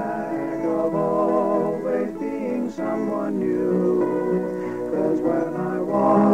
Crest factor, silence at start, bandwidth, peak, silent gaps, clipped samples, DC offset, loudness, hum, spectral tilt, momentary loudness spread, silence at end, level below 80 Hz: 16 dB; 0 s; 10.5 kHz; -6 dBFS; none; under 0.1%; 0.2%; -23 LUFS; none; -9 dB/octave; 6 LU; 0 s; -58 dBFS